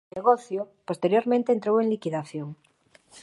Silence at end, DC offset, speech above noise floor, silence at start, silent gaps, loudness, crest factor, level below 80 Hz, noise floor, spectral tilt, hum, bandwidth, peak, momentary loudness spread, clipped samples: 0.05 s; under 0.1%; 30 dB; 0.15 s; none; -25 LUFS; 18 dB; -74 dBFS; -55 dBFS; -7 dB/octave; none; 11.5 kHz; -6 dBFS; 12 LU; under 0.1%